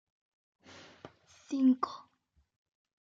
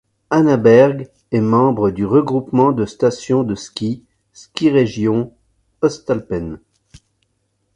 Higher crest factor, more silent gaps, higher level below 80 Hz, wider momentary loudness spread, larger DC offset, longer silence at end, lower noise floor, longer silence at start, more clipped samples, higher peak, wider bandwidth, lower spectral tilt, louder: about the same, 20 dB vs 16 dB; neither; second, -82 dBFS vs -48 dBFS; first, 25 LU vs 13 LU; neither; about the same, 1.1 s vs 1.2 s; first, -74 dBFS vs -67 dBFS; first, 1.5 s vs 0.3 s; neither; second, -18 dBFS vs 0 dBFS; second, 7.4 kHz vs 10.5 kHz; second, -5 dB/octave vs -7 dB/octave; second, -31 LUFS vs -16 LUFS